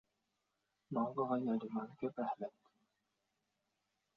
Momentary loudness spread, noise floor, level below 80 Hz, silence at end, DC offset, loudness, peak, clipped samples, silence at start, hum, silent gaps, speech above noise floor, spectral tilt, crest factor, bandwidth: 8 LU; -86 dBFS; -86 dBFS; 1.65 s; under 0.1%; -41 LUFS; -24 dBFS; under 0.1%; 0.9 s; none; none; 47 dB; -7.5 dB/octave; 20 dB; 5.2 kHz